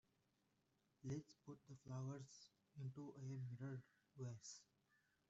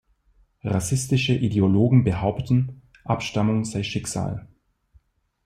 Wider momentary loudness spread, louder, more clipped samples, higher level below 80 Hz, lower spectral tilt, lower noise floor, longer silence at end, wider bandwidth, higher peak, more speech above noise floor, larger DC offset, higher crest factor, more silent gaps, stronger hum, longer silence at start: about the same, 11 LU vs 12 LU; second, -55 LUFS vs -23 LUFS; neither; second, -86 dBFS vs -48 dBFS; first, -7.5 dB/octave vs -6 dB/octave; first, -85 dBFS vs -61 dBFS; second, 0.65 s vs 1 s; second, 8 kHz vs 14 kHz; second, -38 dBFS vs -6 dBFS; second, 32 dB vs 40 dB; neither; about the same, 18 dB vs 18 dB; neither; neither; first, 1.05 s vs 0.65 s